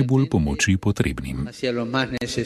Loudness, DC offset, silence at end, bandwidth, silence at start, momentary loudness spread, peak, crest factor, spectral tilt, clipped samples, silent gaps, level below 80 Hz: -23 LUFS; under 0.1%; 0 s; 13 kHz; 0 s; 7 LU; -4 dBFS; 18 dB; -5.5 dB/octave; under 0.1%; none; -38 dBFS